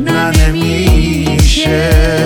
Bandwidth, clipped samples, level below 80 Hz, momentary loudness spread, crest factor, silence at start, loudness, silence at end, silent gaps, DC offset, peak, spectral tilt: 18 kHz; under 0.1%; -14 dBFS; 2 LU; 10 dB; 0 s; -11 LUFS; 0 s; none; under 0.1%; 0 dBFS; -5 dB/octave